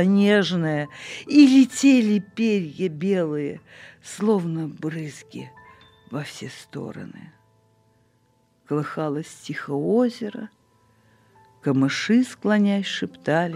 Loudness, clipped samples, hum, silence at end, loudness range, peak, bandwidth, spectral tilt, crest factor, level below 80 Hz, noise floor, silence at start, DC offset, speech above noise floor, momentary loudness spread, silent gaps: -22 LUFS; under 0.1%; none; 0 s; 16 LU; -4 dBFS; 12 kHz; -6 dB/octave; 20 dB; -72 dBFS; -64 dBFS; 0 s; under 0.1%; 42 dB; 21 LU; none